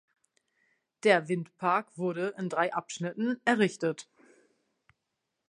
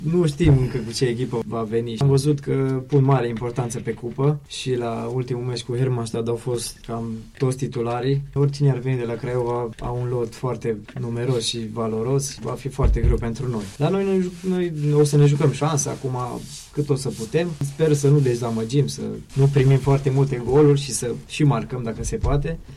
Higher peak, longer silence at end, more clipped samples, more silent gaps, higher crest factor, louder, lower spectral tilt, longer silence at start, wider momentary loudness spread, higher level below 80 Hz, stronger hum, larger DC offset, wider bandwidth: about the same, -8 dBFS vs -8 dBFS; first, 1.45 s vs 0 s; neither; neither; first, 24 dB vs 14 dB; second, -30 LUFS vs -22 LUFS; second, -5 dB/octave vs -6.5 dB/octave; first, 1.05 s vs 0 s; about the same, 9 LU vs 10 LU; second, -84 dBFS vs -34 dBFS; neither; neither; second, 11 kHz vs 13 kHz